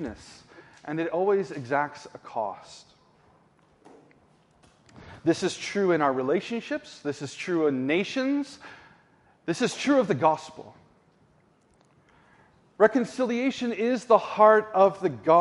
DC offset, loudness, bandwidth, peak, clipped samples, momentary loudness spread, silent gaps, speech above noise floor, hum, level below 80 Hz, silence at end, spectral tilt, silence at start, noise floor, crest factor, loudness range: under 0.1%; -25 LUFS; 11.5 kHz; -6 dBFS; under 0.1%; 16 LU; none; 38 dB; none; -68 dBFS; 0 s; -5.5 dB/octave; 0 s; -63 dBFS; 22 dB; 11 LU